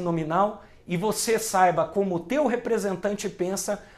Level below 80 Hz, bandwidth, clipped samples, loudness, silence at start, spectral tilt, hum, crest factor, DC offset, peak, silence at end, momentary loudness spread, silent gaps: -56 dBFS; 15.5 kHz; under 0.1%; -25 LUFS; 0 s; -4.5 dB/octave; none; 18 dB; under 0.1%; -6 dBFS; 0.15 s; 8 LU; none